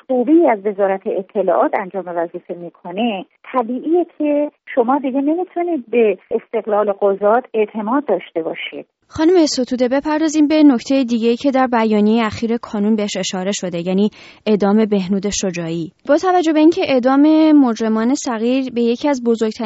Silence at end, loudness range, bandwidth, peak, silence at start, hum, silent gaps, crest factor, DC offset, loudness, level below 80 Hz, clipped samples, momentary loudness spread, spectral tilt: 0 s; 5 LU; 8 kHz; -2 dBFS; 0.1 s; none; none; 14 dB; under 0.1%; -16 LUFS; -54 dBFS; under 0.1%; 10 LU; -5 dB/octave